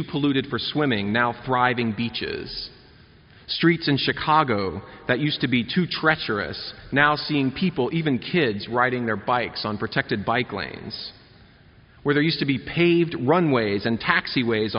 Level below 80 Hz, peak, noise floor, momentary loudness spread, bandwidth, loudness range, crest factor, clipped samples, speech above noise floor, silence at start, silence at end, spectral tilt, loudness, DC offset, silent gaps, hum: -52 dBFS; -4 dBFS; -52 dBFS; 11 LU; 5.6 kHz; 4 LU; 20 dB; under 0.1%; 29 dB; 0 s; 0 s; -3.5 dB/octave; -23 LUFS; under 0.1%; none; none